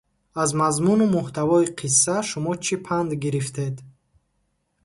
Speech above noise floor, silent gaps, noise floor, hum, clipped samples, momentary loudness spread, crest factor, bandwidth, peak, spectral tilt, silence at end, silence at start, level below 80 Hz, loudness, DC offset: 49 dB; none; -71 dBFS; none; under 0.1%; 10 LU; 18 dB; 11.5 kHz; -4 dBFS; -4.5 dB/octave; 0.95 s; 0.35 s; -58 dBFS; -22 LUFS; under 0.1%